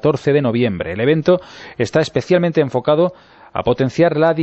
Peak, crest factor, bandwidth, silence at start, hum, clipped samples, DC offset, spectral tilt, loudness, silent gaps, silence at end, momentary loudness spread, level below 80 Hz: -2 dBFS; 14 dB; 8.2 kHz; 0 s; none; under 0.1%; under 0.1%; -7 dB/octave; -17 LUFS; none; 0 s; 6 LU; -48 dBFS